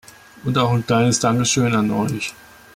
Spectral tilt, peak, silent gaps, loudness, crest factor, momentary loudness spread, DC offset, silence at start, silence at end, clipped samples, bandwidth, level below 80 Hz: -4.5 dB/octave; -6 dBFS; none; -19 LUFS; 14 dB; 10 LU; under 0.1%; 0.45 s; 0.4 s; under 0.1%; 16 kHz; -52 dBFS